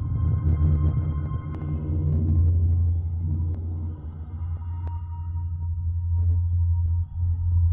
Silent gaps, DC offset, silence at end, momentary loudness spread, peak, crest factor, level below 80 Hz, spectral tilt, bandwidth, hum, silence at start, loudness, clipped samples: none; under 0.1%; 0 s; 10 LU; -12 dBFS; 12 dB; -34 dBFS; -13 dB/octave; 2.2 kHz; none; 0 s; -26 LUFS; under 0.1%